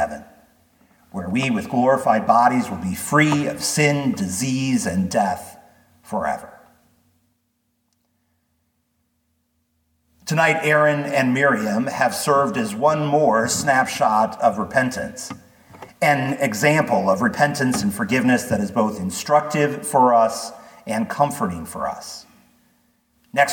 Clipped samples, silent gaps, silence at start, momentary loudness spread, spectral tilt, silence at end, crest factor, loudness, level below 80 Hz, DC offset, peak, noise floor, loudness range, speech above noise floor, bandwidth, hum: under 0.1%; none; 0 s; 12 LU; -4.5 dB/octave; 0 s; 18 dB; -20 LUFS; -58 dBFS; under 0.1%; -2 dBFS; -70 dBFS; 8 LU; 51 dB; 19 kHz; none